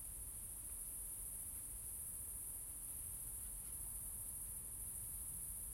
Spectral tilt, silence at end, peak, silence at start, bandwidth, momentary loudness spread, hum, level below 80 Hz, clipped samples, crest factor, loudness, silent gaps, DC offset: -2 dB/octave; 0 s; -34 dBFS; 0 s; 16.5 kHz; 1 LU; none; -60 dBFS; under 0.1%; 16 dB; -46 LUFS; none; under 0.1%